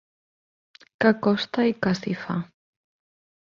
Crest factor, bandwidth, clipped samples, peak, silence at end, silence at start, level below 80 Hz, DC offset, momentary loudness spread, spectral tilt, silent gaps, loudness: 22 dB; 7.2 kHz; under 0.1%; -4 dBFS; 0.95 s; 1 s; -62 dBFS; under 0.1%; 10 LU; -6.5 dB/octave; none; -24 LUFS